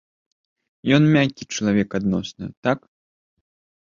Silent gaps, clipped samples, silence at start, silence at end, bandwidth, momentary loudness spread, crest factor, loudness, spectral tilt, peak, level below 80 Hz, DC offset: 2.57-2.63 s; under 0.1%; 0.85 s; 1.1 s; 7.4 kHz; 12 LU; 20 dB; -21 LUFS; -6 dB/octave; -4 dBFS; -54 dBFS; under 0.1%